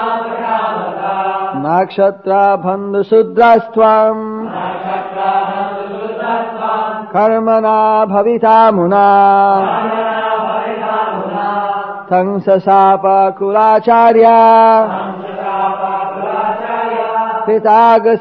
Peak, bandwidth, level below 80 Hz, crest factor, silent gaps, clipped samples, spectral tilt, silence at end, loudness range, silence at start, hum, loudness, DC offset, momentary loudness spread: 0 dBFS; 5.4 kHz; -60 dBFS; 12 dB; none; under 0.1%; -8.5 dB/octave; 0 s; 6 LU; 0 s; none; -12 LUFS; 0.1%; 11 LU